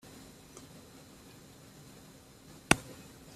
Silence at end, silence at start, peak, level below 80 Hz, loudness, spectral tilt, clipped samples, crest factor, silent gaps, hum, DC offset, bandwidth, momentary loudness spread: 0 s; 0.05 s; -2 dBFS; -58 dBFS; -30 LUFS; -3 dB/octave; under 0.1%; 38 dB; none; none; under 0.1%; 15.5 kHz; 25 LU